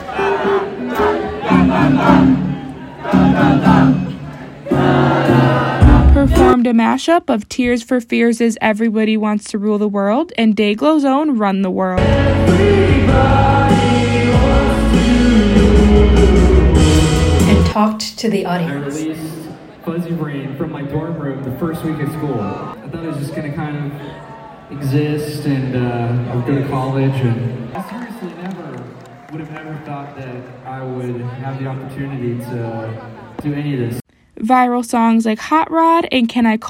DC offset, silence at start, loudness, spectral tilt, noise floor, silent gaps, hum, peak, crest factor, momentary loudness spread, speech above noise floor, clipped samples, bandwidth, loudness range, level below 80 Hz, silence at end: under 0.1%; 0 s; -14 LUFS; -7 dB/octave; -35 dBFS; none; none; 0 dBFS; 14 dB; 17 LU; 20 dB; under 0.1%; 16.5 kHz; 13 LU; -24 dBFS; 0 s